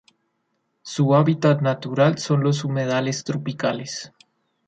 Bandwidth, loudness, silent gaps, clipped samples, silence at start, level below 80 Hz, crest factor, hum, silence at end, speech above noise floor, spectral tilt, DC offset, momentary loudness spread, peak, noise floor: 9 kHz; -21 LUFS; none; under 0.1%; 0.85 s; -66 dBFS; 16 dB; none; 0.6 s; 52 dB; -6 dB/octave; under 0.1%; 14 LU; -6 dBFS; -72 dBFS